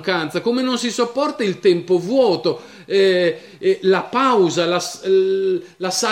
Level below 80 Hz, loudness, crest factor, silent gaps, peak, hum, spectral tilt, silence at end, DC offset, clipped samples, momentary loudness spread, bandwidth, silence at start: -68 dBFS; -18 LUFS; 14 dB; none; -4 dBFS; none; -4 dB/octave; 0 s; under 0.1%; under 0.1%; 6 LU; 15.5 kHz; 0 s